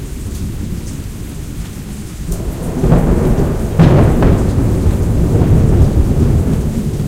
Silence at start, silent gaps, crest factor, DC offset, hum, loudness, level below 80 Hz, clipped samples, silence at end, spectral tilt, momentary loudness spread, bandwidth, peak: 0 s; none; 12 dB; under 0.1%; none; -14 LUFS; -18 dBFS; 0.2%; 0 s; -8 dB/octave; 16 LU; 16.5 kHz; 0 dBFS